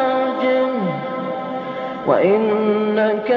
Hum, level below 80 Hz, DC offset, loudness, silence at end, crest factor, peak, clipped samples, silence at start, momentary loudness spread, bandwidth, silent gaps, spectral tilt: none; -64 dBFS; under 0.1%; -19 LUFS; 0 s; 16 dB; -2 dBFS; under 0.1%; 0 s; 10 LU; 5.8 kHz; none; -4.5 dB/octave